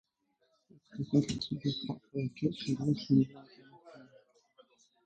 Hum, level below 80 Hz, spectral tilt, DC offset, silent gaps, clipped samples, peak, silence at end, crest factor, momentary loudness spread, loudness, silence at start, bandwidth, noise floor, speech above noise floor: none; -66 dBFS; -7 dB/octave; under 0.1%; none; under 0.1%; -14 dBFS; 1 s; 22 dB; 12 LU; -33 LUFS; 0.95 s; 9 kHz; -77 dBFS; 44 dB